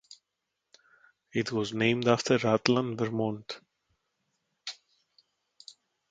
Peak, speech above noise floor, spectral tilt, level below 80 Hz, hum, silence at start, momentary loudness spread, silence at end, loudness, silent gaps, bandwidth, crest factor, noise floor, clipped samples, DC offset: -6 dBFS; 57 dB; -5 dB/octave; -70 dBFS; none; 1.35 s; 23 LU; 0.4 s; -28 LUFS; none; 9.2 kHz; 26 dB; -84 dBFS; under 0.1%; under 0.1%